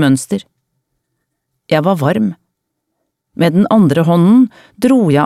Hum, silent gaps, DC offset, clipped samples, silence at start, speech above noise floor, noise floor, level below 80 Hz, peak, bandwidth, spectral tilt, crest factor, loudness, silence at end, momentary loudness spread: none; none; under 0.1%; under 0.1%; 0 s; 61 dB; -72 dBFS; -56 dBFS; 0 dBFS; 14 kHz; -7 dB/octave; 12 dB; -13 LUFS; 0 s; 10 LU